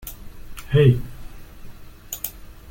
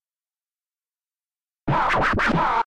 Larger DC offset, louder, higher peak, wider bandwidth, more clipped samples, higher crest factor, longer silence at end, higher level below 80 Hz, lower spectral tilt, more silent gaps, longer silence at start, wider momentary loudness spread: neither; about the same, -21 LUFS vs -21 LUFS; first, -4 dBFS vs -12 dBFS; first, 17 kHz vs 12 kHz; neither; first, 20 dB vs 14 dB; about the same, 0 s vs 0 s; about the same, -40 dBFS vs -40 dBFS; about the same, -6.5 dB/octave vs -6 dB/octave; neither; second, 0 s vs 1.65 s; first, 26 LU vs 6 LU